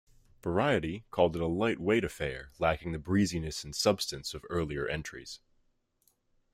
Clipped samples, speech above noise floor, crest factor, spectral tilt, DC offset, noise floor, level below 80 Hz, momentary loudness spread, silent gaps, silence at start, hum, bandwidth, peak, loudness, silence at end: under 0.1%; 42 dB; 20 dB; -5 dB/octave; under 0.1%; -73 dBFS; -54 dBFS; 11 LU; none; 0.45 s; none; 16 kHz; -12 dBFS; -31 LUFS; 1.15 s